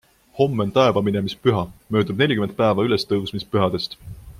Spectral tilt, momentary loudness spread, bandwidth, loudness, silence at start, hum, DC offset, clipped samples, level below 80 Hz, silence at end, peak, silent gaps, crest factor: -7 dB/octave; 8 LU; 15.5 kHz; -21 LUFS; 0.35 s; none; under 0.1%; under 0.1%; -50 dBFS; 0 s; -2 dBFS; none; 18 dB